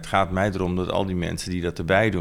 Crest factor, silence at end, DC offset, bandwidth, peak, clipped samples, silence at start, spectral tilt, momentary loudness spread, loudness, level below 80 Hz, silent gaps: 18 dB; 0 s; under 0.1%; 15.5 kHz; -4 dBFS; under 0.1%; 0 s; -6 dB/octave; 7 LU; -24 LUFS; -42 dBFS; none